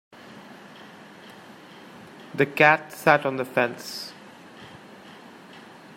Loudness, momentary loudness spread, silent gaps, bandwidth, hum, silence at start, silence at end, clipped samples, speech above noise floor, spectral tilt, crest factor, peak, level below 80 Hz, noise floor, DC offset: -22 LUFS; 27 LU; none; 16 kHz; none; 0.35 s; 1.3 s; under 0.1%; 24 dB; -5 dB/octave; 26 dB; -2 dBFS; -72 dBFS; -46 dBFS; under 0.1%